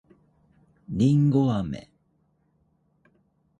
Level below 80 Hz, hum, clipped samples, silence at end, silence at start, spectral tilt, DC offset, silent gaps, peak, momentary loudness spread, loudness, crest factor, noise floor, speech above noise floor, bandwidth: -54 dBFS; none; under 0.1%; 1.8 s; 0.9 s; -9 dB/octave; under 0.1%; none; -10 dBFS; 15 LU; -23 LUFS; 18 dB; -68 dBFS; 46 dB; 8.8 kHz